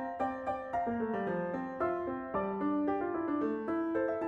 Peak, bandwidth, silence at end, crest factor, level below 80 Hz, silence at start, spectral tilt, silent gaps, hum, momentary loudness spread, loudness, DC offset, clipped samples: -22 dBFS; 6.6 kHz; 0 s; 12 dB; -64 dBFS; 0 s; -9 dB/octave; none; none; 3 LU; -35 LUFS; under 0.1%; under 0.1%